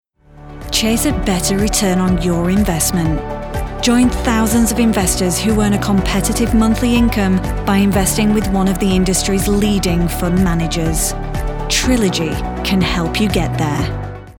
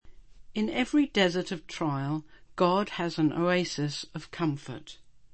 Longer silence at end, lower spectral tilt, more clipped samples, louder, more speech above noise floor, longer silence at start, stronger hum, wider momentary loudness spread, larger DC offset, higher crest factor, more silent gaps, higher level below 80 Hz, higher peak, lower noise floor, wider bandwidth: second, 0.1 s vs 0.4 s; about the same, -4.5 dB/octave vs -5.5 dB/octave; neither; first, -15 LUFS vs -29 LUFS; about the same, 23 dB vs 20 dB; first, 0.35 s vs 0.05 s; neither; second, 6 LU vs 13 LU; second, under 0.1% vs 0.2%; second, 14 dB vs 20 dB; neither; first, -24 dBFS vs -58 dBFS; first, -2 dBFS vs -10 dBFS; second, -38 dBFS vs -49 dBFS; first, 19.5 kHz vs 8.8 kHz